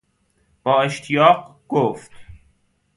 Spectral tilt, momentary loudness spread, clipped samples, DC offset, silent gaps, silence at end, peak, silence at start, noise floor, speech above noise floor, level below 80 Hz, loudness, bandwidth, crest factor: -5.5 dB/octave; 11 LU; under 0.1%; under 0.1%; none; 0.6 s; 0 dBFS; 0.65 s; -64 dBFS; 46 dB; -56 dBFS; -19 LUFS; 11.5 kHz; 20 dB